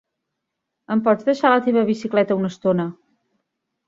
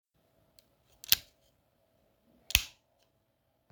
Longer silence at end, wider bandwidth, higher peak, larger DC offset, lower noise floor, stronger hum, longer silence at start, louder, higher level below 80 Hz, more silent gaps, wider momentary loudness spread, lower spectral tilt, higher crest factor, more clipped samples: about the same, 0.95 s vs 1.05 s; second, 7.6 kHz vs over 20 kHz; about the same, -2 dBFS vs -2 dBFS; neither; first, -80 dBFS vs -76 dBFS; neither; second, 0.9 s vs 1.1 s; first, -19 LUFS vs -29 LUFS; second, -66 dBFS vs -52 dBFS; neither; second, 6 LU vs 18 LU; first, -7 dB/octave vs 0.5 dB/octave; second, 20 dB vs 38 dB; neither